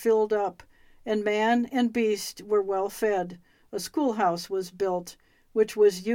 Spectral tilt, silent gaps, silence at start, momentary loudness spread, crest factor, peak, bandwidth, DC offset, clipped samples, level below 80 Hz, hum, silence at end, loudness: -4.5 dB/octave; none; 0 s; 10 LU; 16 dB; -12 dBFS; 17 kHz; under 0.1%; under 0.1%; -64 dBFS; none; 0 s; -27 LUFS